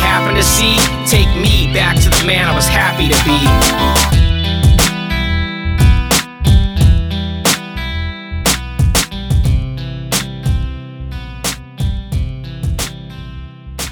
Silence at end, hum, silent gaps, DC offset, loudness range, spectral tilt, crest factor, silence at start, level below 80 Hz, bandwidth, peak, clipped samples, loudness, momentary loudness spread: 0 s; none; none; under 0.1%; 9 LU; -4 dB/octave; 12 dB; 0 s; -18 dBFS; over 20 kHz; 0 dBFS; under 0.1%; -13 LUFS; 13 LU